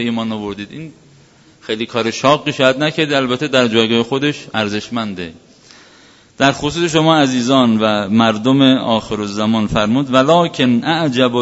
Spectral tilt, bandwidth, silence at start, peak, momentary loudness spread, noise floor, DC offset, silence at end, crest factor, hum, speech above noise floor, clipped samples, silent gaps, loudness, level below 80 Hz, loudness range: -5 dB/octave; 8 kHz; 0 s; 0 dBFS; 12 LU; -47 dBFS; under 0.1%; 0 s; 16 dB; none; 32 dB; under 0.1%; none; -15 LUFS; -48 dBFS; 4 LU